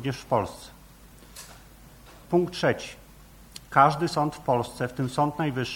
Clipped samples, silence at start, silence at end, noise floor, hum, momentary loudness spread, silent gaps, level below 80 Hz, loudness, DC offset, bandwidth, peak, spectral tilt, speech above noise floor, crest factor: under 0.1%; 0 s; 0 s; -50 dBFS; none; 25 LU; none; -54 dBFS; -26 LUFS; under 0.1%; 17.5 kHz; -4 dBFS; -6 dB/octave; 25 dB; 24 dB